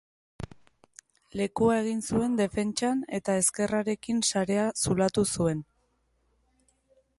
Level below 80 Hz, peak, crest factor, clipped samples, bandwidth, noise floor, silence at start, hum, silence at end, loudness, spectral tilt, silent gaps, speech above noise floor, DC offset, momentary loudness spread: -56 dBFS; -10 dBFS; 18 dB; under 0.1%; 12 kHz; -71 dBFS; 0.4 s; none; 1.55 s; -27 LUFS; -4.5 dB/octave; none; 44 dB; under 0.1%; 12 LU